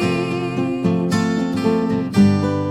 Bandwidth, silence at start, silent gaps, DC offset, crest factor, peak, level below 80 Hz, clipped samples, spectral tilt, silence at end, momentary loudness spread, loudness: 12.5 kHz; 0 s; none; under 0.1%; 14 dB; -4 dBFS; -50 dBFS; under 0.1%; -7 dB/octave; 0 s; 6 LU; -19 LUFS